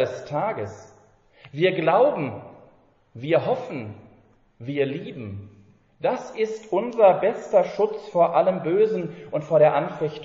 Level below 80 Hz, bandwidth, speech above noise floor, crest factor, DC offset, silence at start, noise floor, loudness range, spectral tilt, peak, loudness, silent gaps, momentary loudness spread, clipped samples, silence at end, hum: -66 dBFS; 7.6 kHz; 35 dB; 18 dB; under 0.1%; 0 s; -57 dBFS; 8 LU; -5 dB/octave; -4 dBFS; -23 LUFS; none; 18 LU; under 0.1%; 0 s; none